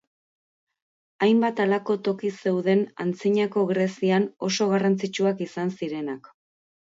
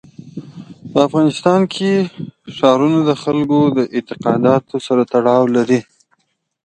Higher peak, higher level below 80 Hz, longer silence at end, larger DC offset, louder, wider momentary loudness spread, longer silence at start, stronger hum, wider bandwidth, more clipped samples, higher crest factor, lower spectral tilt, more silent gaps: second, -10 dBFS vs 0 dBFS; second, -74 dBFS vs -58 dBFS; about the same, 0.75 s vs 0.85 s; neither; second, -24 LUFS vs -15 LUFS; second, 8 LU vs 17 LU; first, 1.2 s vs 0.25 s; neither; second, 7.8 kHz vs 9.4 kHz; neither; about the same, 14 dB vs 16 dB; about the same, -6 dB/octave vs -7 dB/octave; neither